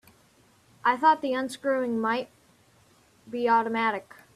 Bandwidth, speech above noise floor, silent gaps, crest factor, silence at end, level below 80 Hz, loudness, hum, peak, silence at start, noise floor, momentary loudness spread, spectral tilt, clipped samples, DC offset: 14 kHz; 36 dB; none; 20 dB; 0.35 s; -74 dBFS; -26 LUFS; none; -8 dBFS; 0.85 s; -61 dBFS; 11 LU; -4.5 dB/octave; under 0.1%; under 0.1%